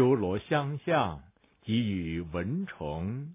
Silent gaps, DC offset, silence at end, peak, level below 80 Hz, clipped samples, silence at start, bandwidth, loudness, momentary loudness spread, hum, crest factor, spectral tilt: none; under 0.1%; 0 s; -14 dBFS; -50 dBFS; under 0.1%; 0 s; 3.8 kHz; -31 LUFS; 7 LU; none; 18 dB; -6 dB/octave